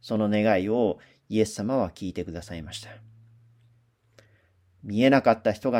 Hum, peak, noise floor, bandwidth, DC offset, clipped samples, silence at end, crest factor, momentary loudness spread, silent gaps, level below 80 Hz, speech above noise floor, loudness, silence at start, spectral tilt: none; -4 dBFS; -63 dBFS; 15.5 kHz; under 0.1%; under 0.1%; 0 s; 22 dB; 18 LU; none; -58 dBFS; 39 dB; -25 LUFS; 0.05 s; -6 dB/octave